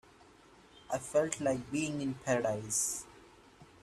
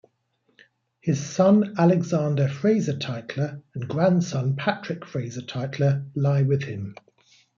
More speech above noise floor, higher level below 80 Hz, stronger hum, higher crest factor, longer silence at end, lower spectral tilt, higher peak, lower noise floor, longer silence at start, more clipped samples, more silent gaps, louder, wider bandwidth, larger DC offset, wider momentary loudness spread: second, 26 dB vs 47 dB; about the same, -66 dBFS vs -66 dBFS; neither; about the same, 20 dB vs 18 dB; second, 0.15 s vs 0.65 s; second, -4 dB/octave vs -7 dB/octave; second, -16 dBFS vs -6 dBFS; second, -60 dBFS vs -70 dBFS; second, 0.75 s vs 1.05 s; neither; neither; second, -34 LUFS vs -24 LUFS; first, 15.5 kHz vs 7.4 kHz; neither; second, 8 LU vs 13 LU